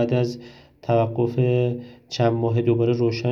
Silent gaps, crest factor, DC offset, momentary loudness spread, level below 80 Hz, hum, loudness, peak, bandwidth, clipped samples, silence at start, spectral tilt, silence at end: none; 16 dB; under 0.1%; 13 LU; -60 dBFS; none; -22 LUFS; -6 dBFS; 7 kHz; under 0.1%; 0 s; -8 dB/octave; 0 s